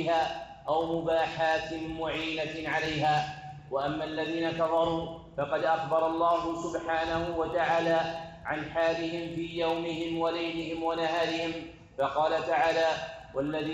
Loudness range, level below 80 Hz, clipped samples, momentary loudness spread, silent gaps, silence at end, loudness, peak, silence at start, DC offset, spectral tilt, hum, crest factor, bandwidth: 2 LU; -56 dBFS; under 0.1%; 9 LU; none; 0 s; -30 LUFS; -14 dBFS; 0 s; under 0.1%; -5.5 dB/octave; none; 16 dB; 9.2 kHz